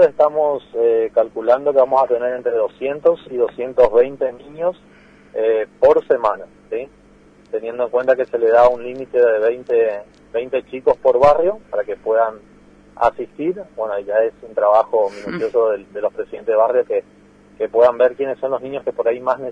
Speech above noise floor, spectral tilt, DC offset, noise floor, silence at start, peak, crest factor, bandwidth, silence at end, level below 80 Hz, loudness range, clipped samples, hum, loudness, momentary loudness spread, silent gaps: 31 dB; -6.5 dB/octave; under 0.1%; -48 dBFS; 0 s; -2 dBFS; 16 dB; 6.8 kHz; 0 s; -52 dBFS; 3 LU; under 0.1%; none; -18 LUFS; 11 LU; none